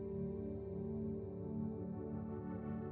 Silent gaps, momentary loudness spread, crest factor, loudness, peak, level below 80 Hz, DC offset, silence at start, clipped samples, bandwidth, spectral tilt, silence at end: none; 2 LU; 12 dB; -44 LUFS; -32 dBFS; -60 dBFS; under 0.1%; 0 s; under 0.1%; 3.1 kHz; -12 dB/octave; 0 s